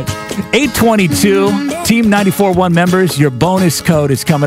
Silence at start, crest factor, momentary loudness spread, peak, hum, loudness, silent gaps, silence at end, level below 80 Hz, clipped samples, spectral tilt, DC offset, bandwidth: 0 s; 12 dB; 4 LU; 0 dBFS; none; -11 LUFS; none; 0 s; -38 dBFS; under 0.1%; -5.5 dB/octave; under 0.1%; 16.5 kHz